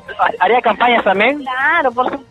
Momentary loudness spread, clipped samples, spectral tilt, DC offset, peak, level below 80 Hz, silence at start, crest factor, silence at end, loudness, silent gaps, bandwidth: 5 LU; under 0.1%; -5.5 dB/octave; under 0.1%; -2 dBFS; -54 dBFS; 0.1 s; 14 dB; 0.1 s; -14 LUFS; none; 10.5 kHz